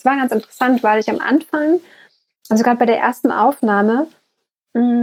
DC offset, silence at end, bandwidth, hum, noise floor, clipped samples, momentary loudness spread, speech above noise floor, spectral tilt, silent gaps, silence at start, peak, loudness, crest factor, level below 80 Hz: under 0.1%; 0 s; 16 kHz; none; -72 dBFS; under 0.1%; 6 LU; 57 dB; -6 dB/octave; none; 0.05 s; -2 dBFS; -16 LUFS; 16 dB; -74 dBFS